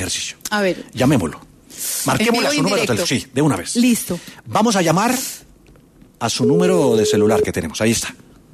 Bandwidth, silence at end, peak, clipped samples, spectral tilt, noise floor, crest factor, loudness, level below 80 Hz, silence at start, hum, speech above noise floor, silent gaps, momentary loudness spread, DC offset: 14 kHz; 0.4 s; -2 dBFS; under 0.1%; -4.5 dB/octave; -48 dBFS; 16 dB; -18 LUFS; -48 dBFS; 0 s; none; 30 dB; none; 11 LU; under 0.1%